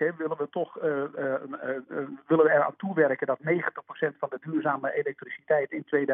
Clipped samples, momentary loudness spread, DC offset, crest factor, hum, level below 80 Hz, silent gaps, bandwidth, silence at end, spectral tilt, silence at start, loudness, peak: under 0.1%; 11 LU; under 0.1%; 20 dB; none; -90 dBFS; none; 3.7 kHz; 0 s; -10.5 dB/octave; 0 s; -28 LUFS; -8 dBFS